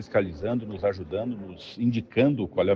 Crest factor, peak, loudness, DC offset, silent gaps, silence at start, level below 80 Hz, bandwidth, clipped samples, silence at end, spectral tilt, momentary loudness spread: 18 dB; -10 dBFS; -27 LUFS; under 0.1%; none; 0 s; -54 dBFS; 7 kHz; under 0.1%; 0 s; -8.5 dB/octave; 9 LU